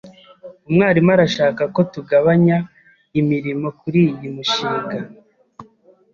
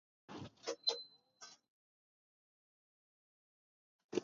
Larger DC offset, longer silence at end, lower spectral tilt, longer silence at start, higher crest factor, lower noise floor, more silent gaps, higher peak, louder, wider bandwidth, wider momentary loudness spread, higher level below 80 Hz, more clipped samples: neither; first, 0.5 s vs 0 s; first, -7 dB/octave vs -2 dB/octave; second, 0.05 s vs 0.3 s; second, 16 dB vs 28 dB; second, -52 dBFS vs -62 dBFS; second, none vs 1.70-4.09 s; first, -2 dBFS vs -22 dBFS; first, -17 LUFS vs -42 LUFS; about the same, 7.2 kHz vs 7.4 kHz; second, 11 LU vs 19 LU; first, -56 dBFS vs -82 dBFS; neither